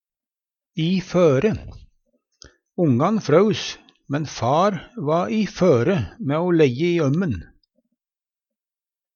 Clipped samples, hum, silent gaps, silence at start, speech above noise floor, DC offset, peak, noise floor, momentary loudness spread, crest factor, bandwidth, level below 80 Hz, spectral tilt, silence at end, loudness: under 0.1%; none; none; 0.75 s; over 71 dB; under 0.1%; -2 dBFS; under -90 dBFS; 11 LU; 20 dB; 7.2 kHz; -50 dBFS; -7 dB/octave; 1.7 s; -20 LUFS